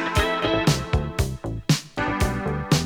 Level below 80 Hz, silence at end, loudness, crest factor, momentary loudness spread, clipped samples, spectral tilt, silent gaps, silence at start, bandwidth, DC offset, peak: -32 dBFS; 0 s; -24 LUFS; 18 dB; 6 LU; under 0.1%; -5 dB/octave; none; 0 s; 19 kHz; under 0.1%; -6 dBFS